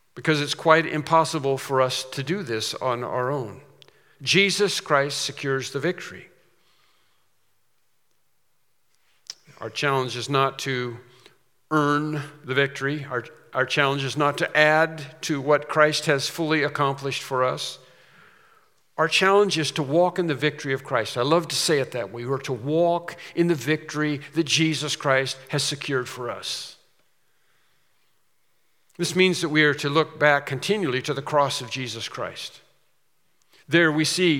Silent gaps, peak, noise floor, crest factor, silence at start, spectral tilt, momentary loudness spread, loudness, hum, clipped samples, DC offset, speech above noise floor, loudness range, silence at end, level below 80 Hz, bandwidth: none; 0 dBFS; -73 dBFS; 24 dB; 0.15 s; -4 dB/octave; 12 LU; -23 LUFS; none; under 0.1%; under 0.1%; 49 dB; 7 LU; 0 s; -76 dBFS; 17 kHz